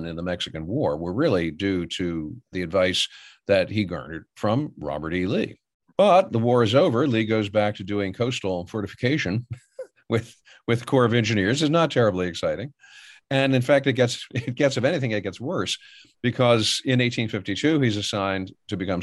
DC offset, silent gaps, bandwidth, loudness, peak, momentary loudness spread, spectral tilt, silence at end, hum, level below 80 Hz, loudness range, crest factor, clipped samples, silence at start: under 0.1%; 5.74-5.80 s; 12 kHz; -23 LUFS; -6 dBFS; 12 LU; -5.5 dB/octave; 0 s; none; -56 dBFS; 4 LU; 16 dB; under 0.1%; 0 s